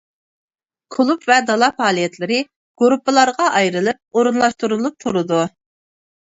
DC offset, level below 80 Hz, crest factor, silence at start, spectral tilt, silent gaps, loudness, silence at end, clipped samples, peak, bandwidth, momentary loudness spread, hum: under 0.1%; -64 dBFS; 18 dB; 0.9 s; -4 dB/octave; 2.56-2.75 s; -17 LUFS; 0.85 s; under 0.1%; 0 dBFS; 8 kHz; 7 LU; none